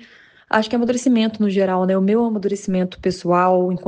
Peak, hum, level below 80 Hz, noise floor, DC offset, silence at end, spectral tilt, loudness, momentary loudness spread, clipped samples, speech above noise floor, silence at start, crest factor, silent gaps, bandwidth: 0 dBFS; none; -54 dBFS; -48 dBFS; under 0.1%; 0 s; -6.5 dB/octave; -19 LUFS; 6 LU; under 0.1%; 30 dB; 0.5 s; 18 dB; none; 9.4 kHz